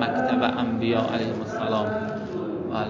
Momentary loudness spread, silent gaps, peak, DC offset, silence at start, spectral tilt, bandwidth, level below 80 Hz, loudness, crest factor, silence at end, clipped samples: 7 LU; none; -6 dBFS; under 0.1%; 0 s; -7 dB/octave; 7.6 kHz; -54 dBFS; -26 LUFS; 18 dB; 0 s; under 0.1%